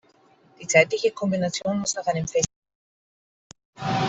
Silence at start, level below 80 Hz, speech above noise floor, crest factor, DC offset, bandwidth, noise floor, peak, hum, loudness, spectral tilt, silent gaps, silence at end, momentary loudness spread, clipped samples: 0.6 s; -58 dBFS; 35 dB; 22 dB; under 0.1%; 8.2 kHz; -58 dBFS; -4 dBFS; none; -23 LUFS; -4 dB/octave; 2.56-2.62 s, 2.75-3.50 s, 3.65-3.73 s; 0 s; 10 LU; under 0.1%